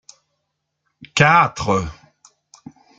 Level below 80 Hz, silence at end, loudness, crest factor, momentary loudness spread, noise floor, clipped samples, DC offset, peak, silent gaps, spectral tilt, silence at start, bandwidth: -48 dBFS; 1.05 s; -16 LUFS; 20 dB; 12 LU; -75 dBFS; under 0.1%; under 0.1%; -2 dBFS; none; -4.5 dB/octave; 1 s; 9.4 kHz